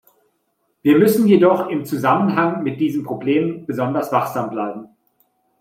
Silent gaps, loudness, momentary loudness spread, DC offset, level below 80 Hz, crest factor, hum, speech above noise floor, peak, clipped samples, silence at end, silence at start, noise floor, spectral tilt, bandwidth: none; -18 LUFS; 10 LU; under 0.1%; -64 dBFS; 16 dB; none; 51 dB; -2 dBFS; under 0.1%; 0.75 s; 0.85 s; -68 dBFS; -7 dB/octave; 16.5 kHz